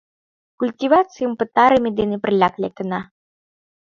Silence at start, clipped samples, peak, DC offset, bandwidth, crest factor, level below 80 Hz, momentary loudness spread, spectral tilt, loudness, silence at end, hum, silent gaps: 0.6 s; under 0.1%; 0 dBFS; under 0.1%; 7.4 kHz; 20 dB; -54 dBFS; 12 LU; -7 dB/octave; -19 LUFS; 0.85 s; none; none